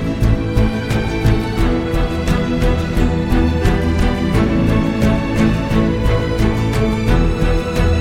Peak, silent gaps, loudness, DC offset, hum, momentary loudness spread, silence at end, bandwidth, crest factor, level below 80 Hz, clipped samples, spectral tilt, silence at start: -2 dBFS; none; -17 LUFS; under 0.1%; none; 2 LU; 0 s; 15.5 kHz; 14 dB; -20 dBFS; under 0.1%; -7 dB/octave; 0 s